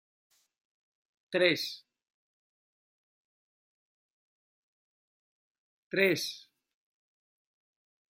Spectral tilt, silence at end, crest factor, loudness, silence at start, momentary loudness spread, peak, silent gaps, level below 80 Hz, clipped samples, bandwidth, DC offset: -3.5 dB/octave; 1.8 s; 28 dB; -30 LUFS; 1.3 s; 16 LU; -10 dBFS; 2.14-5.91 s; -82 dBFS; under 0.1%; 16 kHz; under 0.1%